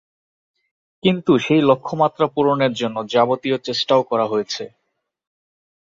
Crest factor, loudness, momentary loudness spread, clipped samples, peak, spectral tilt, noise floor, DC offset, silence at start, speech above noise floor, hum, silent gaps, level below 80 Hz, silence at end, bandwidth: 18 dB; -19 LUFS; 8 LU; under 0.1%; -2 dBFS; -6 dB/octave; -75 dBFS; under 0.1%; 1.05 s; 56 dB; none; none; -62 dBFS; 1.25 s; 7.6 kHz